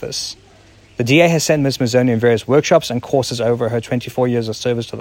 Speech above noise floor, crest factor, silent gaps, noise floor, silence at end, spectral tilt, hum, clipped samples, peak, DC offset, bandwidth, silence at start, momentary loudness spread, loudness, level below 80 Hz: 30 dB; 16 dB; none; -46 dBFS; 0 s; -5 dB/octave; none; under 0.1%; 0 dBFS; under 0.1%; 16.5 kHz; 0 s; 10 LU; -16 LUFS; -52 dBFS